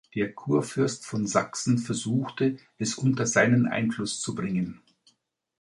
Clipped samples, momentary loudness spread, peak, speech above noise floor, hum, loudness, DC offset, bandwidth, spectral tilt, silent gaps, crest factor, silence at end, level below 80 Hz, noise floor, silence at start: under 0.1%; 9 LU; -8 dBFS; 43 dB; none; -27 LUFS; under 0.1%; 11.5 kHz; -5 dB/octave; none; 20 dB; 0.9 s; -62 dBFS; -69 dBFS; 0.15 s